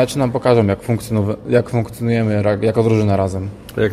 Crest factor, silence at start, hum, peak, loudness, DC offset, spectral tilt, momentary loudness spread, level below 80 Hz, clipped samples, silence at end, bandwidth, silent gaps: 16 dB; 0 s; none; 0 dBFS; -17 LUFS; under 0.1%; -7.5 dB/octave; 7 LU; -44 dBFS; under 0.1%; 0 s; 15 kHz; none